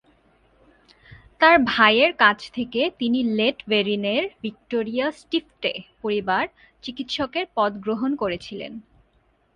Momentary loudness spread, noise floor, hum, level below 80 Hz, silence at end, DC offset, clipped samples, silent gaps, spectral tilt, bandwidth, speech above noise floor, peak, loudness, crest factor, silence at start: 16 LU; -63 dBFS; none; -58 dBFS; 0.75 s; under 0.1%; under 0.1%; none; -5 dB/octave; 10 kHz; 41 dB; 0 dBFS; -22 LUFS; 24 dB; 1.1 s